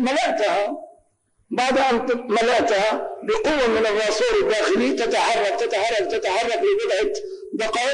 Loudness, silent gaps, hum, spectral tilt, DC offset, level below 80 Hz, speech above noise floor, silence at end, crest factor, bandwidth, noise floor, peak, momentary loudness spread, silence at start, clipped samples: -21 LUFS; none; none; -2.5 dB/octave; under 0.1%; -50 dBFS; 44 dB; 0 s; 8 dB; 10 kHz; -64 dBFS; -12 dBFS; 7 LU; 0 s; under 0.1%